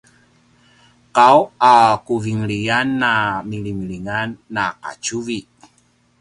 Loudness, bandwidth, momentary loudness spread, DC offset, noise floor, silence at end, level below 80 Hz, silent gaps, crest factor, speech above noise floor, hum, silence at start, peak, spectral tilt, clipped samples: -17 LUFS; 11.5 kHz; 15 LU; under 0.1%; -58 dBFS; 0.8 s; -52 dBFS; none; 18 dB; 41 dB; 60 Hz at -45 dBFS; 1.15 s; 0 dBFS; -4.5 dB/octave; under 0.1%